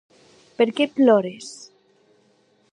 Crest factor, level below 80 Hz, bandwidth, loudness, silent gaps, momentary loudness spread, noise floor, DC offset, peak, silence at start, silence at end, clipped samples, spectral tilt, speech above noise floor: 18 dB; -76 dBFS; 10.5 kHz; -20 LUFS; none; 21 LU; -61 dBFS; under 0.1%; -4 dBFS; 0.6 s; 1.2 s; under 0.1%; -5 dB/octave; 42 dB